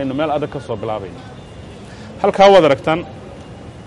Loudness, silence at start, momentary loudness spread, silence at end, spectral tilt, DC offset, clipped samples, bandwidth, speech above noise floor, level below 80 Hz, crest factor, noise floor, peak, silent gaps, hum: -15 LUFS; 0 s; 26 LU; 0 s; -6 dB/octave; under 0.1%; under 0.1%; 11 kHz; 20 dB; -44 dBFS; 16 dB; -35 dBFS; 0 dBFS; none; none